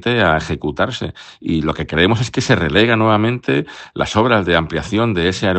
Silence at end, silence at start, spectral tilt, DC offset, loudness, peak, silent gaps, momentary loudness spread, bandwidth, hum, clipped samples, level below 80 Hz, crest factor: 0 s; 0 s; -5.5 dB/octave; under 0.1%; -16 LUFS; 0 dBFS; none; 9 LU; 8.8 kHz; none; under 0.1%; -40 dBFS; 16 dB